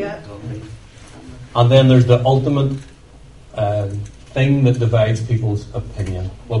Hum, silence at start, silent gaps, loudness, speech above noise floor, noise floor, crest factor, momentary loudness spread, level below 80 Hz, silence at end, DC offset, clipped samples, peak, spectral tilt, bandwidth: none; 0 s; none; -17 LUFS; 27 dB; -42 dBFS; 18 dB; 19 LU; -40 dBFS; 0 s; 0.2%; under 0.1%; 0 dBFS; -8 dB/octave; 10 kHz